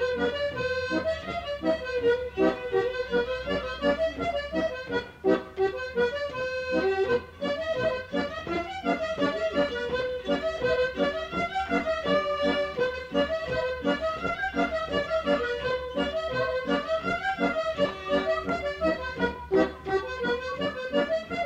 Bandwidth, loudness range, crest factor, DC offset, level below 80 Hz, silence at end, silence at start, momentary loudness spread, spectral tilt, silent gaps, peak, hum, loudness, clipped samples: 9.4 kHz; 1 LU; 18 dB; under 0.1%; -50 dBFS; 0 s; 0 s; 4 LU; -5.5 dB/octave; none; -10 dBFS; none; -28 LUFS; under 0.1%